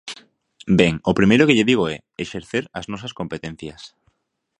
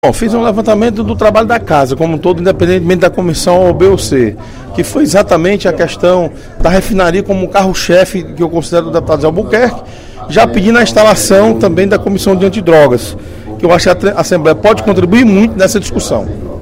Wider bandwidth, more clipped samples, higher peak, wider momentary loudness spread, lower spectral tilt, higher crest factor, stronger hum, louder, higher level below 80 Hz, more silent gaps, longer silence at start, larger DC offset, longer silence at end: second, 10.5 kHz vs 16.5 kHz; second, under 0.1% vs 1%; about the same, 0 dBFS vs 0 dBFS; first, 21 LU vs 8 LU; about the same, -6 dB/octave vs -5.5 dB/octave; first, 20 dB vs 10 dB; neither; second, -19 LUFS vs -9 LUFS; second, -48 dBFS vs -26 dBFS; neither; about the same, 0.05 s vs 0.05 s; neither; first, 0.7 s vs 0 s